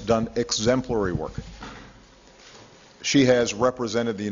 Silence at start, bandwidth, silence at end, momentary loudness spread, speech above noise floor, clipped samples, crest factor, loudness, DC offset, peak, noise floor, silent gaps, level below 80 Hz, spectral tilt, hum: 0 s; 7.8 kHz; 0 s; 21 LU; 28 dB; under 0.1%; 20 dB; -23 LUFS; under 0.1%; -6 dBFS; -51 dBFS; none; -48 dBFS; -4.5 dB/octave; none